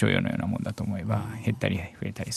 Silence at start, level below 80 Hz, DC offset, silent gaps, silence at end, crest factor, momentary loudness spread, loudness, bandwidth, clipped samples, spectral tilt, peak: 0 s; -54 dBFS; under 0.1%; none; 0 s; 18 dB; 6 LU; -29 LUFS; 13 kHz; under 0.1%; -6 dB/octave; -10 dBFS